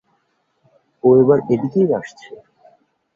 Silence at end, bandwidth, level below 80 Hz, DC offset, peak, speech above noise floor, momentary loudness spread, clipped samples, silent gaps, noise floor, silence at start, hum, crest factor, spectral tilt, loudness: 0.8 s; 7.2 kHz; -58 dBFS; under 0.1%; -2 dBFS; 51 dB; 10 LU; under 0.1%; none; -66 dBFS; 1.05 s; none; 18 dB; -9.5 dB/octave; -16 LUFS